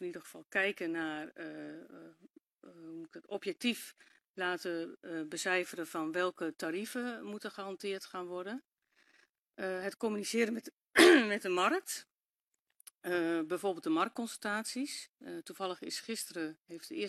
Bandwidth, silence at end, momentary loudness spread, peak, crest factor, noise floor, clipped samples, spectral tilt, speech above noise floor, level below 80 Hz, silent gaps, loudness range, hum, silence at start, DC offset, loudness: 13.5 kHz; 0 s; 15 LU; -10 dBFS; 26 dB; -89 dBFS; under 0.1%; -3 dB/octave; 54 dB; -80 dBFS; 2.30-2.34 s, 4.29-4.34 s, 9.29-9.46 s, 10.72-10.77 s, 12.41-12.51 s, 12.59-12.66 s, 15.09-15.14 s, 16.61-16.65 s; 11 LU; none; 0 s; under 0.1%; -34 LUFS